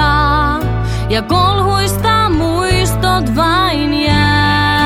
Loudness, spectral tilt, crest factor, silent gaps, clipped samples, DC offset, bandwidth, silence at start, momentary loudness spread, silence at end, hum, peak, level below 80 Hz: -13 LUFS; -5 dB/octave; 12 dB; none; under 0.1%; under 0.1%; 16 kHz; 0 s; 5 LU; 0 s; none; 0 dBFS; -22 dBFS